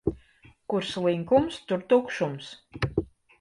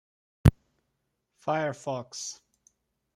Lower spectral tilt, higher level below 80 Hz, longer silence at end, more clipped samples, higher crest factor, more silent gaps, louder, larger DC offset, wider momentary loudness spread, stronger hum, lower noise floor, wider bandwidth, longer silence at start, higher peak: about the same, -6.5 dB/octave vs -6 dB/octave; second, -50 dBFS vs -44 dBFS; second, 0.35 s vs 0.8 s; neither; second, 18 dB vs 28 dB; neither; about the same, -27 LUFS vs -29 LUFS; neither; first, 17 LU vs 14 LU; neither; second, -57 dBFS vs -79 dBFS; second, 11 kHz vs 15 kHz; second, 0.05 s vs 0.45 s; second, -8 dBFS vs -4 dBFS